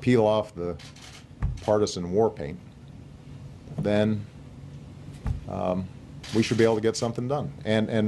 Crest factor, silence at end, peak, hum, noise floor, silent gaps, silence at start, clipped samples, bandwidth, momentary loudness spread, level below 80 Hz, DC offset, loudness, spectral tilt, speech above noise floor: 20 dB; 0 s; -8 dBFS; none; -45 dBFS; none; 0 s; under 0.1%; 12 kHz; 22 LU; -44 dBFS; under 0.1%; -27 LUFS; -6 dB/octave; 20 dB